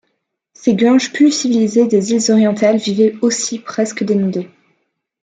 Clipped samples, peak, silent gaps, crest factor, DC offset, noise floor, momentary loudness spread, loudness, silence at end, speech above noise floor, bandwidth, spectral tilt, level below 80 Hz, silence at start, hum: under 0.1%; -2 dBFS; none; 14 dB; under 0.1%; -70 dBFS; 8 LU; -14 LUFS; 0.75 s; 56 dB; 9.4 kHz; -4.5 dB/octave; -62 dBFS; 0.6 s; none